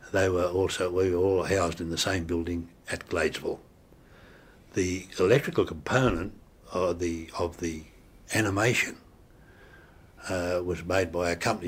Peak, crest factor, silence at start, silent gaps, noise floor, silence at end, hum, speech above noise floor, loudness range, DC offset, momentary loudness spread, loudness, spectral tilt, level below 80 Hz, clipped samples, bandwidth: -8 dBFS; 20 dB; 0 s; none; -55 dBFS; 0 s; none; 27 dB; 3 LU; under 0.1%; 11 LU; -28 LUFS; -5 dB/octave; -50 dBFS; under 0.1%; 16 kHz